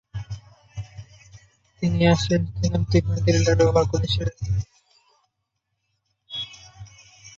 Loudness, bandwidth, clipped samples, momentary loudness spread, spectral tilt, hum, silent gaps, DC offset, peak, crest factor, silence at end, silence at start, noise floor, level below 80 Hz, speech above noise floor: -22 LUFS; 7.8 kHz; under 0.1%; 21 LU; -6 dB/octave; none; none; under 0.1%; -4 dBFS; 20 dB; 0.1 s; 0.15 s; -78 dBFS; -38 dBFS; 57 dB